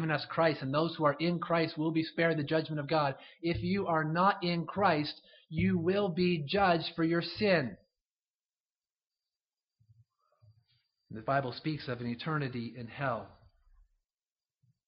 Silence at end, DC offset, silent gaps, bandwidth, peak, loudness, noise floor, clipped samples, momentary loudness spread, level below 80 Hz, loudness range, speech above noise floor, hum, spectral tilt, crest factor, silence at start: 1.6 s; under 0.1%; 8.19-8.23 s, 8.30-8.34 s, 8.60-8.65 s, 8.91-8.95 s; 5.6 kHz; -14 dBFS; -32 LUFS; under -90 dBFS; under 0.1%; 10 LU; -62 dBFS; 9 LU; over 59 dB; none; -4.5 dB/octave; 20 dB; 0 s